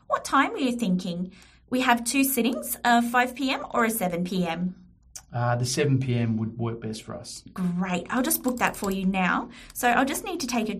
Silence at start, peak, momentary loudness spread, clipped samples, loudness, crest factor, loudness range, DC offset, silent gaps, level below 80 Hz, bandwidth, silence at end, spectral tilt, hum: 0.1 s; -6 dBFS; 12 LU; under 0.1%; -25 LUFS; 20 dB; 4 LU; under 0.1%; none; -54 dBFS; 15.5 kHz; 0 s; -4.5 dB/octave; none